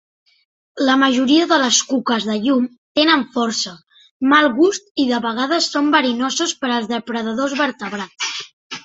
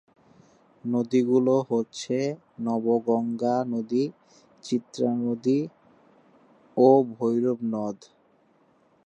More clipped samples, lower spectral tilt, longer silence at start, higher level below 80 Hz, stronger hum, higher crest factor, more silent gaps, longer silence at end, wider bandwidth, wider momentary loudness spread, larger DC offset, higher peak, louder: neither; second, -2 dB/octave vs -7 dB/octave; about the same, 0.75 s vs 0.85 s; first, -64 dBFS vs -76 dBFS; neither; about the same, 16 dB vs 20 dB; first, 2.78-2.95 s, 4.11-4.20 s, 4.91-4.95 s, 8.53-8.70 s vs none; second, 0.05 s vs 1.1 s; about the same, 8 kHz vs 8.6 kHz; about the same, 10 LU vs 11 LU; neither; first, -2 dBFS vs -6 dBFS; first, -17 LUFS vs -25 LUFS